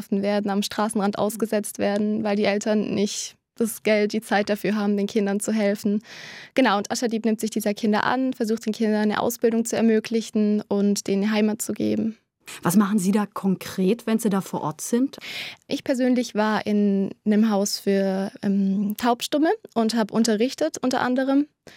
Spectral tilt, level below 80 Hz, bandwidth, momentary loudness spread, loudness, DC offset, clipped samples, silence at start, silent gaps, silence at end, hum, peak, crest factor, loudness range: -5 dB/octave; -70 dBFS; 16.5 kHz; 5 LU; -23 LUFS; under 0.1%; under 0.1%; 0 s; none; 0.3 s; none; -6 dBFS; 16 dB; 2 LU